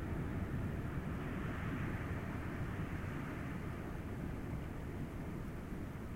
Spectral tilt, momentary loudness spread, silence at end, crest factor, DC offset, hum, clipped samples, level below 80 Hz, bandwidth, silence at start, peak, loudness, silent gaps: -7.5 dB/octave; 4 LU; 0 s; 14 dB; under 0.1%; none; under 0.1%; -48 dBFS; 16 kHz; 0 s; -28 dBFS; -43 LUFS; none